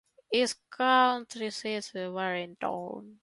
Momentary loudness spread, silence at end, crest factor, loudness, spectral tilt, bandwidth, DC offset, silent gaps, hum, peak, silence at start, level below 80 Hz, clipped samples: 13 LU; 0.1 s; 20 dB; -30 LUFS; -3 dB/octave; 11.5 kHz; under 0.1%; none; none; -10 dBFS; 0.3 s; -78 dBFS; under 0.1%